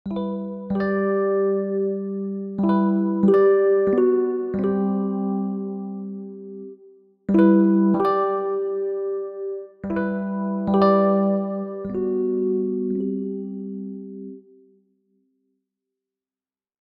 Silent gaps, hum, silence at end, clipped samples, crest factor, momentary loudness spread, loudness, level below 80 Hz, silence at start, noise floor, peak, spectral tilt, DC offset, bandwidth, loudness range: none; none; 2.4 s; under 0.1%; 16 dB; 16 LU; -22 LUFS; -60 dBFS; 0.05 s; under -90 dBFS; -6 dBFS; -11 dB/octave; under 0.1%; 5 kHz; 9 LU